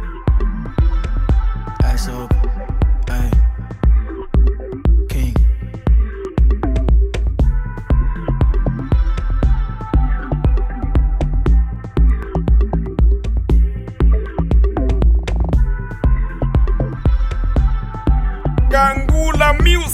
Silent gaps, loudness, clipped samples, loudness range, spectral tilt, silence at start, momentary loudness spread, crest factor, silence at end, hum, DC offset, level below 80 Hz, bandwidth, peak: none; -18 LUFS; under 0.1%; 2 LU; -6.5 dB/octave; 0 s; 5 LU; 14 dB; 0 s; none; under 0.1%; -16 dBFS; 10 kHz; 0 dBFS